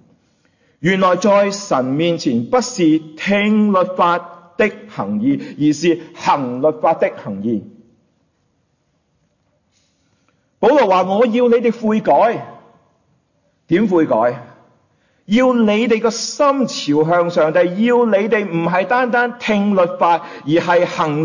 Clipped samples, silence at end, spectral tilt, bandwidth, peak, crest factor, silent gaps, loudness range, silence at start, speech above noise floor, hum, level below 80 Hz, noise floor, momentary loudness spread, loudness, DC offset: under 0.1%; 0 s; -5.5 dB/octave; 7.4 kHz; -2 dBFS; 14 dB; none; 6 LU; 0.8 s; 49 dB; none; -60 dBFS; -64 dBFS; 6 LU; -16 LUFS; under 0.1%